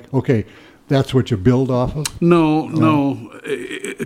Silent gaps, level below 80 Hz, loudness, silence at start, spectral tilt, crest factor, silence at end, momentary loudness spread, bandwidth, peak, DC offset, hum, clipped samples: none; -42 dBFS; -18 LUFS; 0.1 s; -7 dB/octave; 16 dB; 0 s; 12 LU; 16 kHz; -2 dBFS; under 0.1%; none; under 0.1%